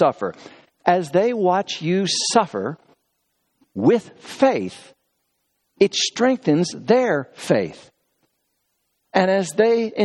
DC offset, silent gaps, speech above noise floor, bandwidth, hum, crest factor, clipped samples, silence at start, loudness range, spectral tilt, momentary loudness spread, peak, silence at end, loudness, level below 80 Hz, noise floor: under 0.1%; none; 53 dB; 12.5 kHz; none; 20 dB; under 0.1%; 0 s; 2 LU; -4.5 dB/octave; 11 LU; 0 dBFS; 0 s; -20 LUFS; -68 dBFS; -72 dBFS